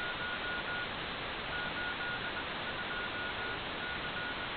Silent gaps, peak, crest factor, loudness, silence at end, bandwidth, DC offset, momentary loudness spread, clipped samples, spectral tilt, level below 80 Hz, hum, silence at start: none; -26 dBFS; 12 dB; -37 LUFS; 0 s; 4.9 kHz; under 0.1%; 2 LU; under 0.1%; -1 dB/octave; -56 dBFS; none; 0 s